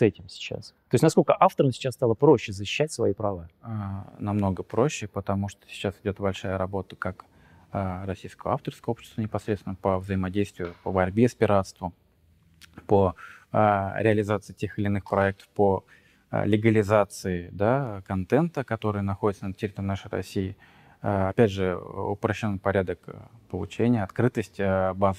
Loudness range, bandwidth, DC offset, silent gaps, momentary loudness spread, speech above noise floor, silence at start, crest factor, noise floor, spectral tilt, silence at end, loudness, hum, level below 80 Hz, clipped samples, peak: 7 LU; 14.5 kHz; under 0.1%; none; 13 LU; 36 dB; 0 s; 22 dB; -61 dBFS; -7 dB/octave; 0 s; -26 LUFS; none; -56 dBFS; under 0.1%; -4 dBFS